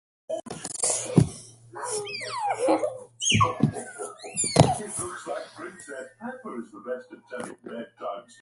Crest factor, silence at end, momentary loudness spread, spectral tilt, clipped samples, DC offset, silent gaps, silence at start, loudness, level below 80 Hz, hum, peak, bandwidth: 28 dB; 0.1 s; 17 LU; -4 dB/octave; under 0.1%; under 0.1%; none; 0.3 s; -27 LUFS; -52 dBFS; none; 0 dBFS; 11.5 kHz